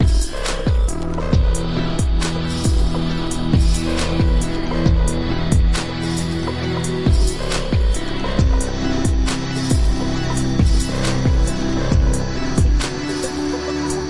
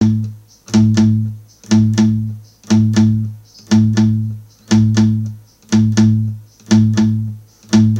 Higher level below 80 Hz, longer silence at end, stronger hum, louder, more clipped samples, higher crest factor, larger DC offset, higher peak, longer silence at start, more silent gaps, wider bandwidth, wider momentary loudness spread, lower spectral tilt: first, -20 dBFS vs -44 dBFS; about the same, 0 s vs 0 s; neither; second, -20 LUFS vs -14 LUFS; neither; about the same, 16 dB vs 14 dB; first, 3% vs under 0.1%; about the same, -2 dBFS vs 0 dBFS; about the same, 0 s vs 0 s; neither; first, 11.5 kHz vs 8.8 kHz; second, 5 LU vs 15 LU; about the same, -5.5 dB/octave vs -6.5 dB/octave